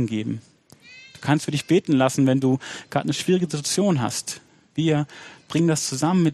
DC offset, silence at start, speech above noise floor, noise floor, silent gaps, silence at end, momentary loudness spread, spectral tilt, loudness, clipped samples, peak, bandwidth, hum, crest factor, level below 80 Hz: under 0.1%; 0 s; 27 dB; -48 dBFS; none; 0 s; 14 LU; -5.5 dB/octave; -22 LUFS; under 0.1%; -4 dBFS; 13.5 kHz; none; 18 dB; -62 dBFS